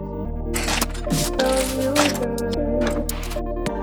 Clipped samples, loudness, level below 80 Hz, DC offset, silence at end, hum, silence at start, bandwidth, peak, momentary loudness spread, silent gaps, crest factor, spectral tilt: under 0.1%; -23 LUFS; -30 dBFS; under 0.1%; 0 s; none; 0 s; over 20 kHz; -2 dBFS; 8 LU; none; 20 dB; -4 dB/octave